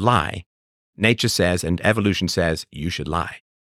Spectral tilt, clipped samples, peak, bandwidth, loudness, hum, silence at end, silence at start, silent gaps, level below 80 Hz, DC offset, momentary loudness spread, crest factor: -4.5 dB/octave; under 0.1%; -2 dBFS; 16.5 kHz; -21 LUFS; none; 0.25 s; 0 s; 0.46-0.93 s; -42 dBFS; under 0.1%; 9 LU; 20 dB